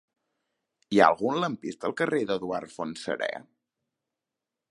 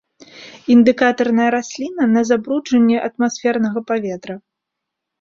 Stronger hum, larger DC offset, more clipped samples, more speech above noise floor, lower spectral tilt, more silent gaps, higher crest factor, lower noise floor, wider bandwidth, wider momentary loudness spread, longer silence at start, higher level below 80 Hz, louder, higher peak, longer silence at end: neither; neither; neither; about the same, 61 dB vs 64 dB; about the same, -5.5 dB/octave vs -5 dB/octave; neither; first, 26 dB vs 16 dB; first, -88 dBFS vs -80 dBFS; first, 11.5 kHz vs 7.4 kHz; about the same, 13 LU vs 14 LU; first, 0.9 s vs 0.35 s; second, -70 dBFS vs -62 dBFS; second, -27 LUFS vs -16 LUFS; about the same, -4 dBFS vs -2 dBFS; first, 1.3 s vs 0.85 s